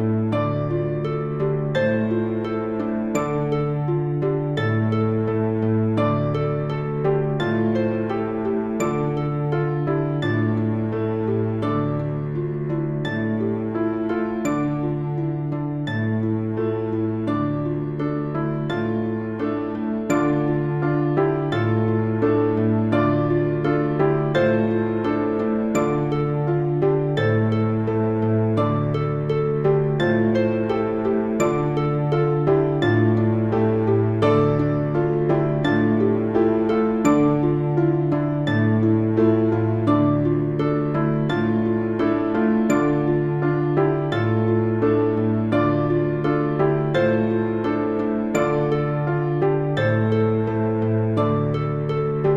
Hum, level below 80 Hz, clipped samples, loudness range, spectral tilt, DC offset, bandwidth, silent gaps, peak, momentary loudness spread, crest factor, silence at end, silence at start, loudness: none; -48 dBFS; under 0.1%; 4 LU; -8.5 dB/octave; under 0.1%; 7.6 kHz; none; -6 dBFS; 5 LU; 14 dB; 0 s; 0 s; -21 LUFS